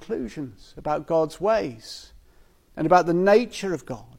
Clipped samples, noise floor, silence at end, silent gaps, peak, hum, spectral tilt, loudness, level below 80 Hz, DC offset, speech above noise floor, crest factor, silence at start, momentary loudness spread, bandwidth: under 0.1%; -55 dBFS; 0.15 s; none; -4 dBFS; none; -6 dB/octave; -23 LUFS; -52 dBFS; under 0.1%; 32 dB; 20 dB; 0 s; 20 LU; 16 kHz